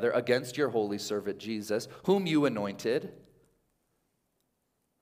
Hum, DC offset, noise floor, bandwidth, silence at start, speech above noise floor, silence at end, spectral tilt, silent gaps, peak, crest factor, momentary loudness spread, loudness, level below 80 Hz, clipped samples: none; under 0.1%; -78 dBFS; 16 kHz; 0 s; 48 dB; 1.85 s; -5.5 dB/octave; none; -12 dBFS; 20 dB; 8 LU; -30 LUFS; -74 dBFS; under 0.1%